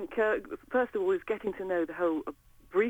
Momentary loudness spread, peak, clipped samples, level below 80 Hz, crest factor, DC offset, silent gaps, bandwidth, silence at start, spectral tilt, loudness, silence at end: 5 LU; -16 dBFS; under 0.1%; -62 dBFS; 16 dB; under 0.1%; none; 18 kHz; 0 s; -6.5 dB/octave; -31 LUFS; 0 s